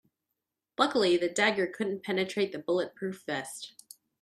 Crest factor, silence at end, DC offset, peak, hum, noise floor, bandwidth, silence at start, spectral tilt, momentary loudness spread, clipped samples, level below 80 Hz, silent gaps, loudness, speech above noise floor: 22 dB; 0.5 s; under 0.1%; -10 dBFS; none; -86 dBFS; 13 kHz; 0.8 s; -4 dB/octave; 14 LU; under 0.1%; -76 dBFS; none; -29 LUFS; 57 dB